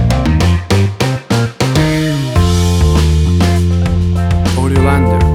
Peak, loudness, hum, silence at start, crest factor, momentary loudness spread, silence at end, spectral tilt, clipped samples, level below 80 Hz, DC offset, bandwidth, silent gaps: 0 dBFS; -12 LUFS; none; 0 s; 10 dB; 3 LU; 0 s; -6 dB/octave; under 0.1%; -18 dBFS; under 0.1%; 14 kHz; none